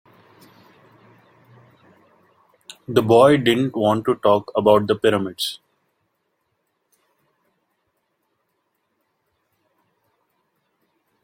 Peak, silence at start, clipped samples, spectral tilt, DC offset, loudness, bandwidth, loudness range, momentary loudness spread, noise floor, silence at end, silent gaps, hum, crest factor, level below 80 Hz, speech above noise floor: 0 dBFS; 2.9 s; under 0.1%; -6 dB/octave; under 0.1%; -18 LUFS; 16.5 kHz; 11 LU; 13 LU; -72 dBFS; 5.65 s; none; none; 22 dB; -62 dBFS; 55 dB